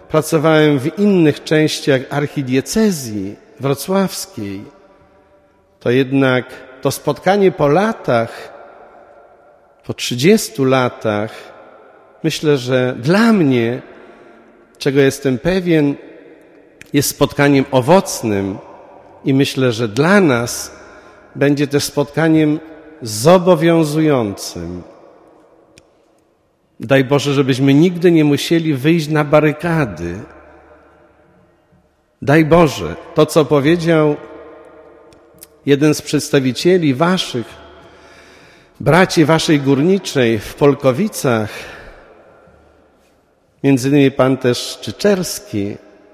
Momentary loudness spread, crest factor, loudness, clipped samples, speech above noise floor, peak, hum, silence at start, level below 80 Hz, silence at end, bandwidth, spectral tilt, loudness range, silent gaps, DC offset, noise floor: 14 LU; 16 dB; -15 LUFS; under 0.1%; 44 dB; 0 dBFS; none; 0.1 s; -46 dBFS; 0.35 s; 15.5 kHz; -5.5 dB/octave; 5 LU; none; under 0.1%; -58 dBFS